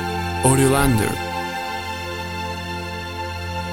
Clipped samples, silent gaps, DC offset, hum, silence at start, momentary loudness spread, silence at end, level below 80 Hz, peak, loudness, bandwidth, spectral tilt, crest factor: under 0.1%; none; under 0.1%; none; 0 s; 12 LU; 0 s; -36 dBFS; -2 dBFS; -22 LUFS; 17 kHz; -4.5 dB/octave; 20 dB